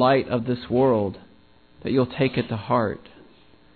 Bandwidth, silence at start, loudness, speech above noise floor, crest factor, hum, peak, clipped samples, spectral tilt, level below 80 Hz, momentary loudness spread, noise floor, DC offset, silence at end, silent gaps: 4.6 kHz; 0 s; -23 LUFS; 33 dB; 16 dB; none; -6 dBFS; under 0.1%; -10.5 dB/octave; -54 dBFS; 12 LU; -55 dBFS; 0.1%; 0.75 s; none